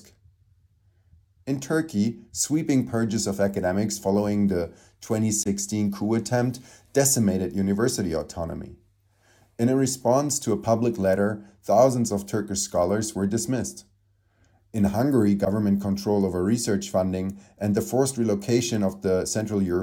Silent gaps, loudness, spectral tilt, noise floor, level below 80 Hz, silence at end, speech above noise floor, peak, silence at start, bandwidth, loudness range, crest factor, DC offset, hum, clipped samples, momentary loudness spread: none; -24 LUFS; -5.5 dB/octave; -65 dBFS; -54 dBFS; 0 s; 41 dB; -6 dBFS; 1.45 s; 17.5 kHz; 3 LU; 18 dB; under 0.1%; none; under 0.1%; 9 LU